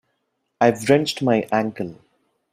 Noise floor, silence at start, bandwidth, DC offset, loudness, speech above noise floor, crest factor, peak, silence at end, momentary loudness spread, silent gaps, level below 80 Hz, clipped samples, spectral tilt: -73 dBFS; 0.6 s; 15.5 kHz; under 0.1%; -20 LUFS; 54 dB; 20 dB; -2 dBFS; 0.6 s; 12 LU; none; -62 dBFS; under 0.1%; -5.5 dB/octave